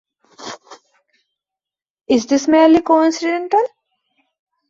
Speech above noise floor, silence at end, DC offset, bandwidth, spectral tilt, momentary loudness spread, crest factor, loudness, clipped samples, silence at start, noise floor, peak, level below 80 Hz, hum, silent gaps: 74 dB; 1.05 s; under 0.1%; 7.6 kHz; -4 dB/octave; 22 LU; 16 dB; -15 LUFS; under 0.1%; 0.4 s; -88 dBFS; -2 dBFS; -58 dBFS; none; 1.90-1.94 s